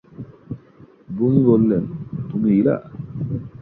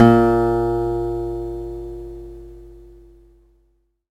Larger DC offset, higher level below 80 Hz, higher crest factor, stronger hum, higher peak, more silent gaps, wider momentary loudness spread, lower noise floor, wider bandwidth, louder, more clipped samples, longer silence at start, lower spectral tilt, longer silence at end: neither; second, -50 dBFS vs -36 dBFS; about the same, 18 dB vs 20 dB; neither; about the same, -2 dBFS vs 0 dBFS; neither; second, 21 LU vs 24 LU; second, -48 dBFS vs -63 dBFS; second, 3.9 kHz vs 9 kHz; about the same, -19 LUFS vs -20 LUFS; neither; first, 0.2 s vs 0 s; first, -13.5 dB/octave vs -9 dB/octave; second, 0 s vs 1.3 s